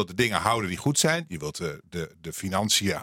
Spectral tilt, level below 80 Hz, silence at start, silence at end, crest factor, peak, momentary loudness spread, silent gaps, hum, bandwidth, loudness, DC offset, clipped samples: -3.5 dB/octave; -58 dBFS; 0 s; 0 s; 22 dB; -4 dBFS; 13 LU; none; none; 16.5 kHz; -26 LUFS; under 0.1%; under 0.1%